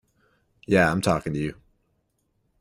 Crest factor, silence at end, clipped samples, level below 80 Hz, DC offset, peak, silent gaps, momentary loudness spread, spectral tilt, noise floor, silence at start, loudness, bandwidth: 22 dB; 1.1 s; under 0.1%; -52 dBFS; under 0.1%; -6 dBFS; none; 10 LU; -6 dB/octave; -72 dBFS; 0.7 s; -24 LUFS; 16 kHz